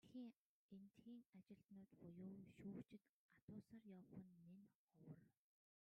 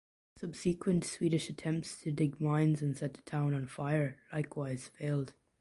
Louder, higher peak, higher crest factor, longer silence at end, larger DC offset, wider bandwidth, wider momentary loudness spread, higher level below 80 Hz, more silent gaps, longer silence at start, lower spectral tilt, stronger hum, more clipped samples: second, -63 LUFS vs -35 LUFS; second, -46 dBFS vs -20 dBFS; about the same, 16 dB vs 16 dB; first, 0.6 s vs 0.3 s; neither; second, 8.8 kHz vs 11.5 kHz; about the same, 9 LU vs 8 LU; second, under -90 dBFS vs -66 dBFS; first, 0.35-0.69 s, 1.26-1.33 s, 3.09-3.29 s, 3.42-3.48 s, 4.75-4.87 s vs none; second, 0.05 s vs 0.35 s; first, -8 dB/octave vs -6.5 dB/octave; neither; neither